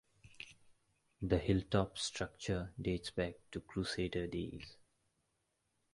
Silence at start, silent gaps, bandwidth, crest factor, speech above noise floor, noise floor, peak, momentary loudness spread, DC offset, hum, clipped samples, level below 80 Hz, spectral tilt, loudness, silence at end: 0.4 s; none; 11.5 kHz; 24 dB; 44 dB; -83 dBFS; -16 dBFS; 19 LU; under 0.1%; none; under 0.1%; -54 dBFS; -5.5 dB/octave; -39 LUFS; 1.2 s